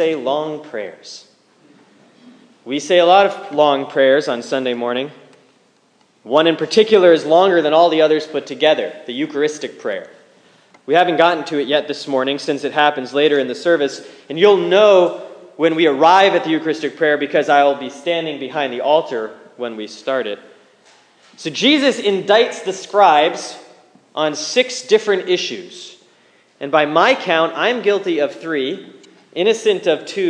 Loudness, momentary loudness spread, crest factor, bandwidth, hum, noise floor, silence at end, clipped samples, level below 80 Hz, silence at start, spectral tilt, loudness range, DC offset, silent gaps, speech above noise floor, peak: -16 LUFS; 16 LU; 16 dB; 10 kHz; none; -56 dBFS; 0 s; under 0.1%; -74 dBFS; 0 s; -4 dB/octave; 6 LU; under 0.1%; none; 41 dB; 0 dBFS